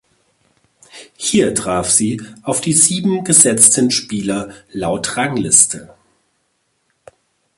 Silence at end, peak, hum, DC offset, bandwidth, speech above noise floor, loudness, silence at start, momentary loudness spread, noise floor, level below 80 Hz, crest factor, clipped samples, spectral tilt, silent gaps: 1.7 s; 0 dBFS; none; under 0.1%; 16 kHz; 51 dB; -13 LUFS; 0.95 s; 14 LU; -66 dBFS; -50 dBFS; 18 dB; under 0.1%; -3 dB/octave; none